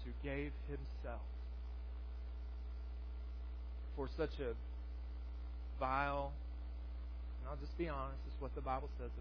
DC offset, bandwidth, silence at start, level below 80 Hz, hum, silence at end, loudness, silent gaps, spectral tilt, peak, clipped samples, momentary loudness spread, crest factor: under 0.1%; 5.4 kHz; 0 s; -46 dBFS; 60 Hz at -45 dBFS; 0 s; -46 LUFS; none; -6 dB/octave; -24 dBFS; under 0.1%; 8 LU; 20 dB